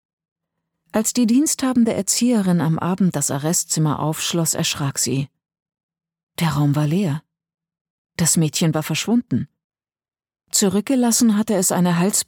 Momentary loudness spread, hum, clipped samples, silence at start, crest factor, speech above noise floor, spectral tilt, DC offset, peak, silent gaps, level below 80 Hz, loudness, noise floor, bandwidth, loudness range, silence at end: 8 LU; none; under 0.1%; 0.95 s; 18 dB; 59 dB; -4.5 dB/octave; under 0.1%; -2 dBFS; 5.62-5.66 s, 5.83-5.89 s, 6.23-6.27 s, 7.81-8.05 s, 9.64-9.70 s; -58 dBFS; -19 LUFS; -78 dBFS; 19 kHz; 4 LU; 0.05 s